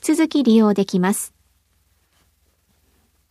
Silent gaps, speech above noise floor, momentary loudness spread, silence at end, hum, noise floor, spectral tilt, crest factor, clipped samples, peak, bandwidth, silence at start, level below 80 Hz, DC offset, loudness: none; 46 dB; 10 LU; 2.05 s; none; -63 dBFS; -5.5 dB/octave; 16 dB; under 0.1%; -6 dBFS; 15 kHz; 0.05 s; -64 dBFS; under 0.1%; -17 LUFS